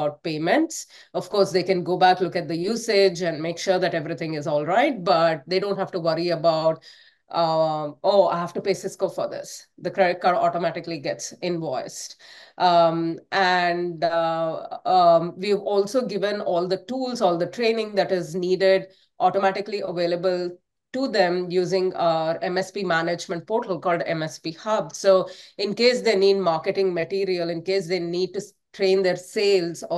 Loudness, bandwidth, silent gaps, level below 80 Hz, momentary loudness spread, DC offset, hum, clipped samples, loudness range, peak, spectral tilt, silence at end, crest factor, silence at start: -23 LUFS; 12.5 kHz; none; -72 dBFS; 10 LU; under 0.1%; none; under 0.1%; 3 LU; -4 dBFS; -5 dB/octave; 0 s; 18 dB; 0 s